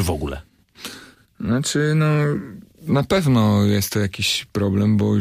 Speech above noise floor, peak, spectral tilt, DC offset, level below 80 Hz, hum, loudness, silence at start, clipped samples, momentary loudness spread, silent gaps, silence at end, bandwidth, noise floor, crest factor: 24 dB; -6 dBFS; -5.5 dB/octave; under 0.1%; -42 dBFS; none; -20 LUFS; 0 s; under 0.1%; 18 LU; none; 0 s; 15.5 kHz; -43 dBFS; 14 dB